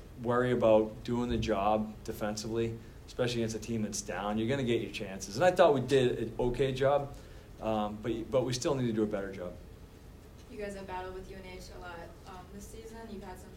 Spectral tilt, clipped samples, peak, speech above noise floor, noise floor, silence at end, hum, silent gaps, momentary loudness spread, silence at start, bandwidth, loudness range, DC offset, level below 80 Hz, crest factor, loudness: -5.5 dB/octave; under 0.1%; -12 dBFS; 20 dB; -52 dBFS; 0 s; none; none; 20 LU; 0 s; 16 kHz; 15 LU; under 0.1%; -50 dBFS; 22 dB; -31 LUFS